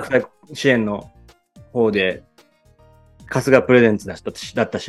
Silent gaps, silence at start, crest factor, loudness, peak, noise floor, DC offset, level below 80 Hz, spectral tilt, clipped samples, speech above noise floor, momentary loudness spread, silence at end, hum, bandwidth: none; 0 s; 20 dB; -19 LUFS; 0 dBFS; -54 dBFS; under 0.1%; -54 dBFS; -5.5 dB/octave; under 0.1%; 36 dB; 16 LU; 0 s; none; 12.5 kHz